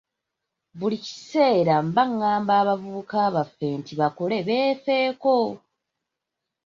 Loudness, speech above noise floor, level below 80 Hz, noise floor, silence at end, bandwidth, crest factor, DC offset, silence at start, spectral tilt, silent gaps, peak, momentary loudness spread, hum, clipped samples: -23 LUFS; 61 dB; -68 dBFS; -84 dBFS; 1.1 s; 7.4 kHz; 18 dB; under 0.1%; 0.75 s; -6.5 dB/octave; none; -6 dBFS; 8 LU; none; under 0.1%